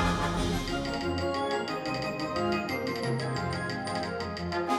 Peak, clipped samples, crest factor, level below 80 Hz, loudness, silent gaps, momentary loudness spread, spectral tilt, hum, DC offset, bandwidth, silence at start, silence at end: -16 dBFS; under 0.1%; 14 dB; -44 dBFS; -31 LUFS; none; 3 LU; -5.5 dB/octave; none; under 0.1%; 16 kHz; 0 s; 0 s